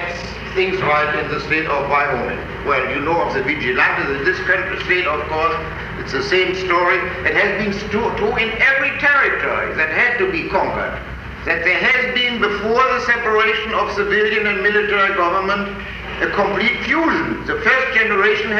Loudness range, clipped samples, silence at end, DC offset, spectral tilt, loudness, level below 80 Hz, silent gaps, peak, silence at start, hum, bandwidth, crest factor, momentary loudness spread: 2 LU; under 0.1%; 0 s; under 0.1%; -5 dB/octave; -17 LUFS; -38 dBFS; none; -2 dBFS; 0 s; none; 8.6 kHz; 14 dB; 8 LU